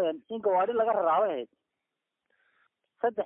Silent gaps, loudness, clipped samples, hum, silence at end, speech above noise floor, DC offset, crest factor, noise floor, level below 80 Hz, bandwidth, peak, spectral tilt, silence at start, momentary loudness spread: none; -28 LUFS; under 0.1%; none; 0 s; 58 dB; under 0.1%; 14 dB; -86 dBFS; -78 dBFS; 3.7 kHz; -16 dBFS; -8.5 dB/octave; 0 s; 9 LU